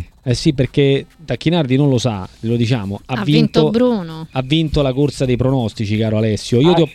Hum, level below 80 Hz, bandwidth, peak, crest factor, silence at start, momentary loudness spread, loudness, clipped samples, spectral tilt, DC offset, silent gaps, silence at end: none; -38 dBFS; 12.5 kHz; 0 dBFS; 16 dB; 0 s; 8 LU; -16 LUFS; under 0.1%; -7 dB/octave; under 0.1%; none; 0 s